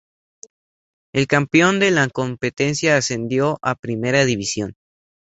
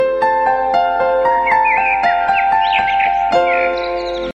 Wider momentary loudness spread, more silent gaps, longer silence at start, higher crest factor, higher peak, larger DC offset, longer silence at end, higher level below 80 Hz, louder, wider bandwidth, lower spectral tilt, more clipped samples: first, 9 LU vs 3 LU; first, 3.79-3.83 s vs none; first, 1.15 s vs 0 s; first, 18 dB vs 12 dB; about the same, -2 dBFS vs -2 dBFS; neither; first, 0.7 s vs 0.05 s; second, -54 dBFS vs -42 dBFS; second, -19 LUFS vs -14 LUFS; about the same, 8.2 kHz vs 9 kHz; about the same, -4.5 dB/octave vs -4.5 dB/octave; neither